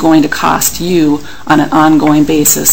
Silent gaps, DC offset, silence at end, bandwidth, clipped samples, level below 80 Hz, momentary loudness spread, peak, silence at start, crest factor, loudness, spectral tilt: none; 6%; 0 s; 17.5 kHz; 1%; -36 dBFS; 4 LU; 0 dBFS; 0 s; 10 dB; -9 LUFS; -4 dB/octave